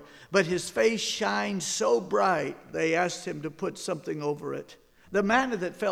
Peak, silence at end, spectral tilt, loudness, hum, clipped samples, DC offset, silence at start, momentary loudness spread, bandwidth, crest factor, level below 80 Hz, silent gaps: -10 dBFS; 0 s; -3.5 dB/octave; -28 LUFS; none; under 0.1%; under 0.1%; 0 s; 9 LU; 15.5 kHz; 18 dB; -62 dBFS; none